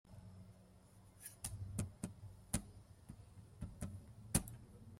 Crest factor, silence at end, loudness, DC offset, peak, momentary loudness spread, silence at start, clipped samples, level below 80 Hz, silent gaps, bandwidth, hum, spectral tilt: 30 dB; 0 s; -46 LUFS; under 0.1%; -18 dBFS; 22 LU; 0.05 s; under 0.1%; -58 dBFS; none; 16 kHz; none; -4.5 dB/octave